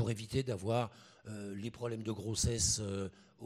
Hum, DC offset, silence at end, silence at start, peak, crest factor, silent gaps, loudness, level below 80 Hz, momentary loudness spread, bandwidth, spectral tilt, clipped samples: none; under 0.1%; 0 s; 0 s; -18 dBFS; 20 dB; none; -37 LUFS; -52 dBFS; 14 LU; 16 kHz; -4 dB/octave; under 0.1%